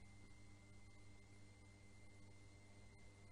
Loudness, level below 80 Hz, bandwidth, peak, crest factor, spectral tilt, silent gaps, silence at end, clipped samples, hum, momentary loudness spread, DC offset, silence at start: -66 LUFS; -72 dBFS; 10 kHz; -50 dBFS; 12 dB; -5 dB/octave; none; 0 s; under 0.1%; none; 1 LU; under 0.1%; 0 s